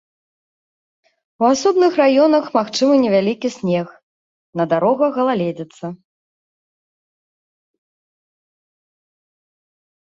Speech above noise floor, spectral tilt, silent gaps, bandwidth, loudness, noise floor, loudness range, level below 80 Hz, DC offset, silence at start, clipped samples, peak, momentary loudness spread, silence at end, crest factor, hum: over 74 dB; -5.5 dB/octave; 4.03-4.53 s; 7.8 kHz; -16 LUFS; under -90 dBFS; 9 LU; -66 dBFS; under 0.1%; 1.4 s; under 0.1%; -2 dBFS; 16 LU; 4.15 s; 18 dB; none